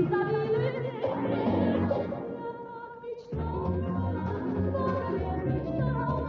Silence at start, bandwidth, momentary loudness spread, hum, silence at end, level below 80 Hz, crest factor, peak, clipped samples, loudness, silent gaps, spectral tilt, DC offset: 0 s; 6 kHz; 11 LU; none; 0 s; -48 dBFS; 14 dB; -16 dBFS; under 0.1%; -30 LUFS; none; -7.5 dB/octave; under 0.1%